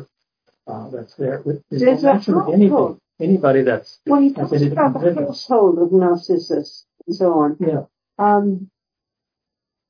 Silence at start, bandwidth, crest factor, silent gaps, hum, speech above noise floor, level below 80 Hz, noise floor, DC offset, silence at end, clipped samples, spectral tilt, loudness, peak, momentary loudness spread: 0 s; 5.2 kHz; 16 dB; none; none; 68 dB; -72 dBFS; -84 dBFS; under 0.1%; 1.25 s; under 0.1%; -8.5 dB/octave; -17 LUFS; -2 dBFS; 15 LU